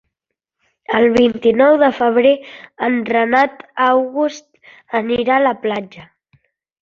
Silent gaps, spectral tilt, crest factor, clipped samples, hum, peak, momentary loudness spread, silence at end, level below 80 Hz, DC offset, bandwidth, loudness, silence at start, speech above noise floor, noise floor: none; -5.5 dB/octave; 16 dB; under 0.1%; none; 0 dBFS; 10 LU; 0.8 s; -56 dBFS; under 0.1%; 7.4 kHz; -15 LUFS; 0.9 s; 65 dB; -80 dBFS